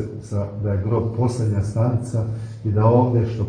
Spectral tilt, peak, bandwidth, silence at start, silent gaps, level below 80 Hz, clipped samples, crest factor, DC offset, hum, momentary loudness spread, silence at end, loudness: -9 dB/octave; -4 dBFS; 10 kHz; 0 s; none; -46 dBFS; under 0.1%; 16 dB; under 0.1%; none; 11 LU; 0 s; -21 LUFS